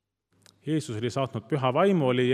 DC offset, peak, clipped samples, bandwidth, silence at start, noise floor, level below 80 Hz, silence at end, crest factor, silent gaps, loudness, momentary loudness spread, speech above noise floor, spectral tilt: under 0.1%; -10 dBFS; under 0.1%; 12.5 kHz; 0.65 s; -62 dBFS; -72 dBFS; 0 s; 16 dB; none; -26 LUFS; 8 LU; 37 dB; -6.5 dB/octave